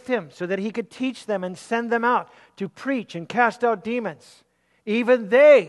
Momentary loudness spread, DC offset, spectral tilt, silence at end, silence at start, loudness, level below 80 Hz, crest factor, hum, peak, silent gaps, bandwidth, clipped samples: 12 LU; under 0.1%; -5.5 dB/octave; 0 s; 0.1 s; -23 LUFS; -74 dBFS; 18 dB; none; -4 dBFS; none; 11.5 kHz; under 0.1%